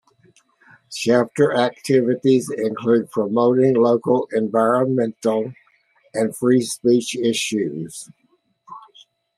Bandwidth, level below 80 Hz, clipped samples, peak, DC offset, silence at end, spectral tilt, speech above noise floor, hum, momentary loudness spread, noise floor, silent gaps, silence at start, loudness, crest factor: 13.5 kHz; -66 dBFS; under 0.1%; -2 dBFS; under 0.1%; 0.6 s; -5.5 dB/octave; 41 dB; none; 9 LU; -60 dBFS; none; 0.9 s; -19 LUFS; 18 dB